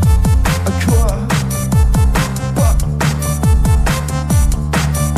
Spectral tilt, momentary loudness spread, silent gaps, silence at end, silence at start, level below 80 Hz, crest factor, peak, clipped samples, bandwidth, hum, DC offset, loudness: -5.5 dB/octave; 4 LU; none; 0 s; 0 s; -16 dBFS; 12 dB; 0 dBFS; under 0.1%; 15 kHz; none; under 0.1%; -15 LUFS